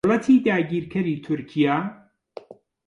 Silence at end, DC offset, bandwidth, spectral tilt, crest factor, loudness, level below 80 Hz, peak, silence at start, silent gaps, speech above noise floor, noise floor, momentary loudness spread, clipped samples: 0.95 s; under 0.1%; 9.8 kHz; -7.5 dB/octave; 16 dB; -22 LUFS; -60 dBFS; -8 dBFS; 0.05 s; none; 23 dB; -44 dBFS; 16 LU; under 0.1%